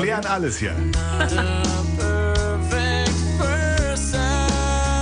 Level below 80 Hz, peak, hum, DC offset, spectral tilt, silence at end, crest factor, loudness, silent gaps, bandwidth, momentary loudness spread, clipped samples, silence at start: -26 dBFS; -6 dBFS; none; under 0.1%; -4.5 dB/octave; 0 s; 14 dB; -21 LUFS; none; 10 kHz; 2 LU; under 0.1%; 0 s